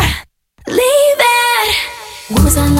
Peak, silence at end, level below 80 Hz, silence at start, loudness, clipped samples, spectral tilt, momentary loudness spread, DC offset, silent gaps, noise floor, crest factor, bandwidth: 0 dBFS; 0 s; -22 dBFS; 0 s; -12 LUFS; under 0.1%; -4 dB/octave; 15 LU; under 0.1%; none; -36 dBFS; 12 dB; 17.5 kHz